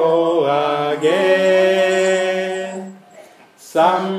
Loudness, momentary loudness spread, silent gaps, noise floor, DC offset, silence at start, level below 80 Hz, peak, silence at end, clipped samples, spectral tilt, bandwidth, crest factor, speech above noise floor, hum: -16 LUFS; 11 LU; none; -44 dBFS; under 0.1%; 0 s; -72 dBFS; -2 dBFS; 0 s; under 0.1%; -4.5 dB/octave; 14.5 kHz; 14 dB; 30 dB; none